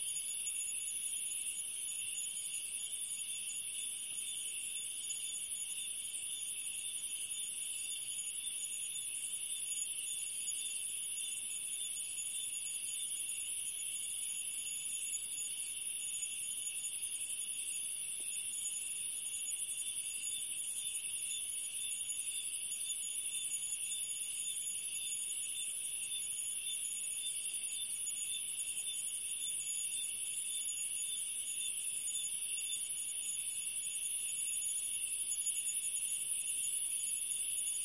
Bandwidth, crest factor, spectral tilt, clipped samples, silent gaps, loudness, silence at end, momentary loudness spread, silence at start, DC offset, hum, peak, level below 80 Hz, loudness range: 11.5 kHz; 16 dB; 3 dB/octave; under 0.1%; none; -36 LUFS; 0 s; 4 LU; 0 s; under 0.1%; none; -22 dBFS; -82 dBFS; 3 LU